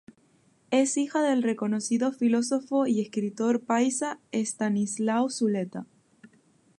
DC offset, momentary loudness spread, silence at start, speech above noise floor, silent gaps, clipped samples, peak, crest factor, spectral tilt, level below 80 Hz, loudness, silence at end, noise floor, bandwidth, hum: under 0.1%; 6 LU; 0.7 s; 38 dB; none; under 0.1%; -10 dBFS; 16 dB; -4.5 dB/octave; -78 dBFS; -27 LUFS; 0.95 s; -64 dBFS; 11.5 kHz; none